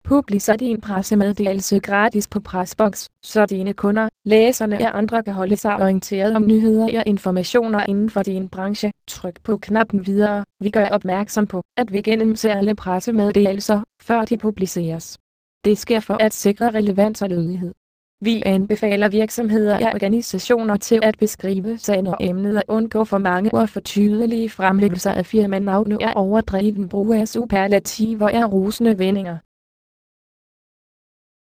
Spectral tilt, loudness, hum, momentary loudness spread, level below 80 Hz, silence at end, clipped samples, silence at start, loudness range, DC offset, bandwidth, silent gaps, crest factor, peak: -5.5 dB/octave; -19 LUFS; none; 6 LU; -48 dBFS; 2.1 s; under 0.1%; 0.05 s; 3 LU; under 0.1%; 15.5 kHz; 11.65-11.69 s, 15.20-15.61 s, 17.77-18.18 s; 16 dB; -2 dBFS